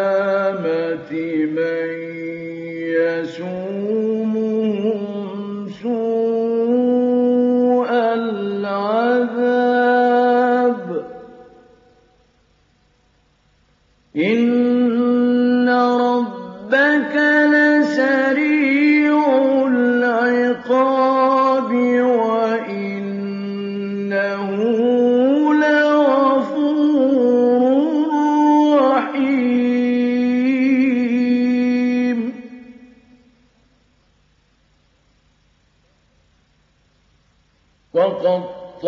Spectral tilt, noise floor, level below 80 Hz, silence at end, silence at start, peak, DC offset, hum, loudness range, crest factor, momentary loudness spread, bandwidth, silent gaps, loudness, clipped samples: -7 dB/octave; -59 dBFS; -66 dBFS; 0 s; 0 s; -4 dBFS; under 0.1%; none; 8 LU; 14 dB; 11 LU; 7.2 kHz; none; -17 LUFS; under 0.1%